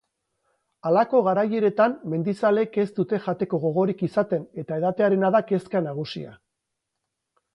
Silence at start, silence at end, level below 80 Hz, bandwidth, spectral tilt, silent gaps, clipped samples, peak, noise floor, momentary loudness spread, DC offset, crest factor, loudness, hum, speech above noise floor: 0.85 s; 1.2 s; -70 dBFS; 11 kHz; -8.5 dB/octave; none; under 0.1%; -8 dBFS; -81 dBFS; 10 LU; under 0.1%; 16 dB; -23 LUFS; none; 59 dB